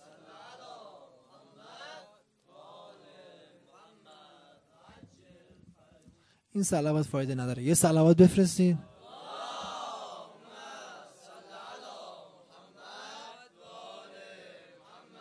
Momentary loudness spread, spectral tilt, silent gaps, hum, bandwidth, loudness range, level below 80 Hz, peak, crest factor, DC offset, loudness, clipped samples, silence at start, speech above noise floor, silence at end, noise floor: 30 LU; -6 dB/octave; none; none; 11 kHz; 23 LU; -66 dBFS; -8 dBFS; 24 dB; under 0.1%; -27 LUFS; under 0.1%; 0.55 s; 38 dB; 0.85 s; -63 dBFS